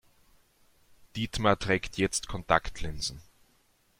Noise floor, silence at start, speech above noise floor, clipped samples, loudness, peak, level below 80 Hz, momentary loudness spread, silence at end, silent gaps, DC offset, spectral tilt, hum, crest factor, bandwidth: -67 dBFS; 1.15 s; 38 dB; under 0.1%; -30 LUFS; -6 dBFS; -46 dBFS; 12 LU; 0.8 s; none; under 0.1%; -4 dB/octave; none; 26 dB; 16.5 kHz